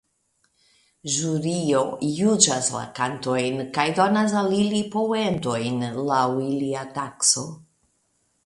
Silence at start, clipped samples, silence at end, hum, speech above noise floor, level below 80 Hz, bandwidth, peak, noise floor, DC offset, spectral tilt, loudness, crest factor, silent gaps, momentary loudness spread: 1.05 s; under 0.1%; 0.9 s; none; 46 dB; -62 dBFS; 11.5 kHz; -2 dBFS; -69 dBFS; under 0.1%; -3.5 dB/octave; -23 LUFS; 22 dB; none; 8 LU